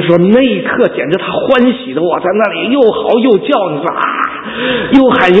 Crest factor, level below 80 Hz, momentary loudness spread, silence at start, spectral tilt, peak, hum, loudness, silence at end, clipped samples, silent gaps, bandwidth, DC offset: 10 dB; -46 dBFS; 7 LU; 0 s; -7.5 dB/octave; 0 dBFS; none; -11 LUFS; 0 s; 0.4%; none; 8 kHz; under 0.1%